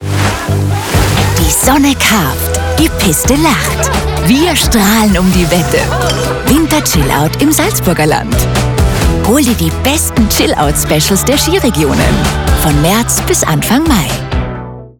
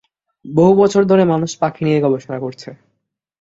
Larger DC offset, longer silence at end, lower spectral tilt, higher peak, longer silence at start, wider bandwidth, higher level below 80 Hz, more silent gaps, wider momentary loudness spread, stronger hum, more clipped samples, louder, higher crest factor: neither; second, 0.1 s vs 0.7 s; second, -4.5 dB/octave vs -7 dB/octave; about the same, 0 dBFS vs -2 dBFS; second, 0 s vs 0.45 s; first, over 20 kHz vs 7.8 kHz; first, -20 dBFS vs -56 dBFS; neither; second, 4 LU vs 16 LU; neither; neither; first, -10 LUFS vs -15 LUFS; about the same, 10 dB vs 14 dB